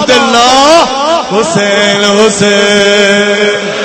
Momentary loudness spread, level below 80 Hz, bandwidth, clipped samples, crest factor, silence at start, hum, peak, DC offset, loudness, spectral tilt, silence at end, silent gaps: 5 LU; -42 dBFS; 11 kHz; 2%; 8 dB; 0 s; none; 0 dBFS; 0.3%; -6 LUFS; -3 dB/octave; 0 s; none